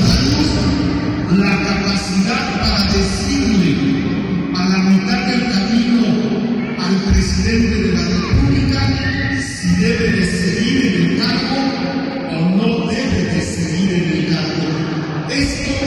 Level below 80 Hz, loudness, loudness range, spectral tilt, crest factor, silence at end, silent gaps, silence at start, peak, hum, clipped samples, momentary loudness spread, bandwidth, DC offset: -28 dBFS; -16 LUFS; 2 LU; -5.5 dB/octave; 10 dB; 0 s; none; 0 s; -6 dBFS; none; under 0.1%; 5 LU; 12 kHz; under 0.1%